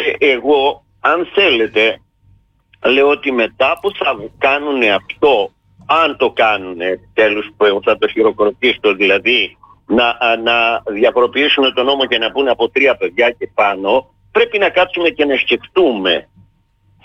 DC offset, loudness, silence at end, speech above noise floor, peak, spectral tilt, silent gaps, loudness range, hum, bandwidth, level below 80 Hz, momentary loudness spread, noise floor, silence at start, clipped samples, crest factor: under 0.1%; -14 LUFS; 0.85 s; 41 dB; -2 dBFS; -5 dB/octave; none; 2 LU; none; 7 kHz; -52 dBFS; 6 LU; -55 dBFS; 0 s; under 0.1%; 12 dB